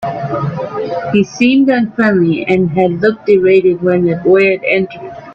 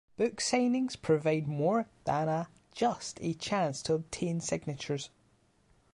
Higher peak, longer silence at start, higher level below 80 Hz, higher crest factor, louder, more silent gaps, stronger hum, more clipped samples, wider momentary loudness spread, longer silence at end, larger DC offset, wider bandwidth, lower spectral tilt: first, 0 dBFS vs -16 dBFS; second, 0 s vs 0.2 s; first, -50 dBFS vs -64 dBFS; about the same, 12 dB vs 16 dB; first, -12 LUFS vs -32 LUFS; neither; neither; neither; about the same, 10 LU vs 8 LU; second, 0 s vs 0.85 s; neither; second, 6.8 kHz vs 11.5 kHz; first, -7.5 dB/octave vs -5 dB/octave